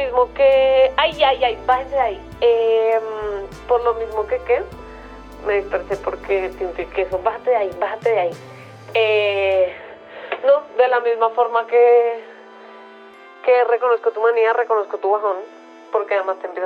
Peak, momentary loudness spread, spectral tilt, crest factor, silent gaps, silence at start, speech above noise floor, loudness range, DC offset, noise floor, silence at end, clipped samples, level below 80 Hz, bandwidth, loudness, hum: -2 dBFS; 14 LU; -5 dB/octave; 16 dB; none; 0 s; 24 dB; 5 LU; under 0.1%; -42 dBFS; 0 s; under 0.1%; -46 dBFS; 7 kHz; -18 LUFS; none